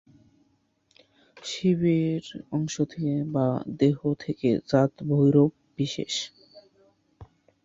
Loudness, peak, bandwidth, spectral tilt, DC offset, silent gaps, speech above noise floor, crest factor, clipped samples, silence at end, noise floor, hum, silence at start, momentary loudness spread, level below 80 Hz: -26 LUFS; -8 dBFS; 8 kHz; -6.5 dB/octave; under 0.1%; none; 44 dB; 20 dB; under 0.1%; 0.4 s; -68 dBFS; none; 1.4 s; 10 LU; -62 dBFS